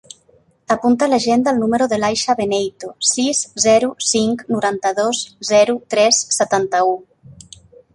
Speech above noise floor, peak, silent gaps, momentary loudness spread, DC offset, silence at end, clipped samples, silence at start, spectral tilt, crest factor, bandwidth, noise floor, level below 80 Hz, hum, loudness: 38 dB; -2 dBFS; none; 6 LU; under 0.1%; 0.6 s; under 0.1%; 0.7 s; -2.5 dB/octave; 16 dB; 11.5 kHz; -55 dBFS; -56 dBFS; none; -16 LUFS